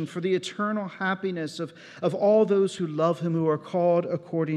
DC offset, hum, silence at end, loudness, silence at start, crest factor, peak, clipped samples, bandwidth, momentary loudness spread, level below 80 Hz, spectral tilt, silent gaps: under 0.1%; none; 0 s; -26 LUFS; 0 s; 16 dB; -10 dBFS; under 0.1%; 11 kHz; 10 LU; -80 dBFS; -6.5 dB/octave; none